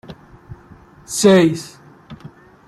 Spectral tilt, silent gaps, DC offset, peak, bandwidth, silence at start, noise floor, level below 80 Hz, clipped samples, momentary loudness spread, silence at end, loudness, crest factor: -5 dB/octave; none; under 0.1%; -2 dBFS; 14 kHz; 0.1 s; -45 dBFS; -52 dBFS; under 0.1%; 27 LU; 0.4 s; -15 LUFS; 18 dB